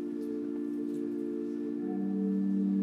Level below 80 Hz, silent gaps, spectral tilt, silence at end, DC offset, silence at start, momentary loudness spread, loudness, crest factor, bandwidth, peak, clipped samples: -78 dBFS; none; -10 dB/octave; 0 s; under 0.1%; 0 s; 6 LU; -34 LUFS; 12 dB; 5.4 kHz; -20 dBFS; under 0.1%